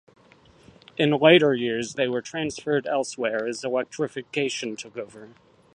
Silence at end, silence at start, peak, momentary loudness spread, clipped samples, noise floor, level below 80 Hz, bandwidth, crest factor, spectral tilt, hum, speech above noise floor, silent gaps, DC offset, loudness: 0.45 s; 1 s; -2 dBFS; 17 LU; under 0.1%; -55 dBFS; -66 dBFS; 10.5 kHz; 22 dB; -4.5 dB/octave; none; 31 dB; none; under 0.1%; -24 LUFS